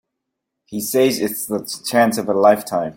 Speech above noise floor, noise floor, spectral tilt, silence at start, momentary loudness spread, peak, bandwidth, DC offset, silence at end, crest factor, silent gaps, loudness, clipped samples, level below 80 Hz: 61 dB; -79 dBFS; -4 dB/octave; 0.7 s; 9 LU; -2 dBFS; 17 kHz; under 0.1%; 0.05 s; 16 dB; none; -18 LUFS; under 0.1%; -62 dBFS